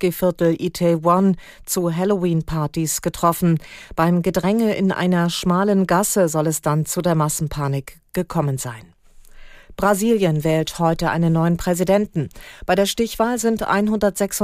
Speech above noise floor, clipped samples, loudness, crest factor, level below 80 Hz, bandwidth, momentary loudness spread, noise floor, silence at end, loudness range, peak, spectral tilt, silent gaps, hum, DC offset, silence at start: 23 dB; under 0.1%; -19 LUFS; 16 dB; -44 dBFS; 15.5 kHz; 7 LU; -42 dBFS; 0 s; 4 LU; -4 dBFS; -5.5 dB/octave; none; none; under 0.1%; 0 s